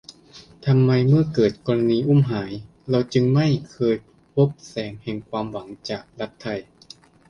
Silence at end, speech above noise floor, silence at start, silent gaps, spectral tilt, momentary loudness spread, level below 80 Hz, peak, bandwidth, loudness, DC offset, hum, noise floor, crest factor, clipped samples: 0.7 s; 28 dB; 0.1 s; none; -8 dB/octave; 14 LU; -54 dBFS; -6 dBFS; 7 kHz; -22 LUFS; under 0.1%; none; -48 dBFS; 16 dB; under 0.1%